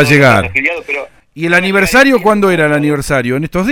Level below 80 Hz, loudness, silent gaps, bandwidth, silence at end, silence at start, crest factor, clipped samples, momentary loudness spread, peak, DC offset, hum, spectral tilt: -36 dBFS; -11 LUFS; none; over 20 kHz; 0 s; 0 s; 10 dB; 0.4%; 12 LU; 0 dBFS; under 0.1%; none; -5.5 dB/octave